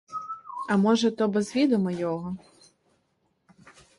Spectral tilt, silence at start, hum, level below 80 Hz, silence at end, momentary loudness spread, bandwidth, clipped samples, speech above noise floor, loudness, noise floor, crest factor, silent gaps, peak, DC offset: -6 dB/octave; 0.1 s; none; -68 dBFS; 0.3 s; 14 LU; 11.5 kHz; under 0.1%; 48 dB; -26 LUFS; -72 dBFS; 16 dB; none; -10 dBFS; under 0.1%